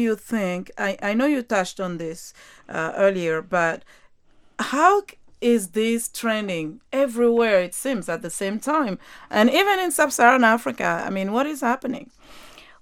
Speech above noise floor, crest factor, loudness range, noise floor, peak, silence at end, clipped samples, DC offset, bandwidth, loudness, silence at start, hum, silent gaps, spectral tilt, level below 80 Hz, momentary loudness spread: 32 dB; 22 dB; 5 LU; -54 dBFS; 0 dBFS; 0.2 s; under 0.1%; under 0.1%; 17 kHz; -22 LUFS; 0 s; none; none; -4 dB/octave; -60 dBFS; 12 LU